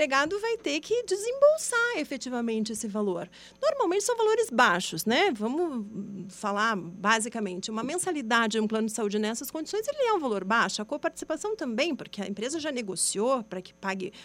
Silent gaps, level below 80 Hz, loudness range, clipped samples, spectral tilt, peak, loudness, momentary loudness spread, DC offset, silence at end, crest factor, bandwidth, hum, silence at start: none; -68 dBFS; 3 LU; under 0.1%; -3 dB/octave; -8 dBFS; -28 LUFS; 10 LU; under 0.1%; 0 s; 20 dB; 16 kHz; none; 0 s